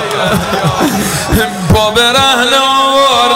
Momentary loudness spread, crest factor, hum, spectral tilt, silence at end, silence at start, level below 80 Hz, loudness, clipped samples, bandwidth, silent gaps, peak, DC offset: 5 LU; 8 dB; none; -3.5 dB/octave; 0 s; 0 s; -28 dBFS; -9 LUFS; under 0.1%; 16 kHz; none; -2 dBFS; under 0.1%